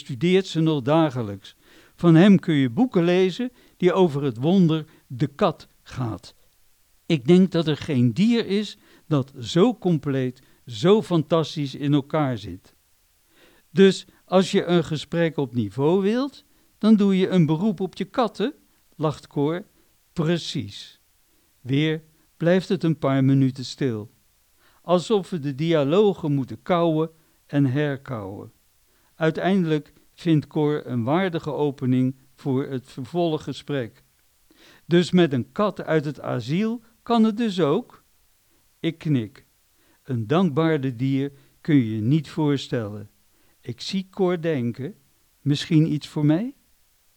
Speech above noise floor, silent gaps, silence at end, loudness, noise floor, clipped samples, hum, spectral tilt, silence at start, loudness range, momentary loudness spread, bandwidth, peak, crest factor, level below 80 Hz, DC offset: 41 dB; none; 0.65 s; -23 LUFS; -62 dBFS; under 0.1%; none; -7.5 dB/octave; 0.1 s; 6 LU; 13 LU; 12 kHz; -4 dBFS; 18 dB; -62 dBFS; under 0.1%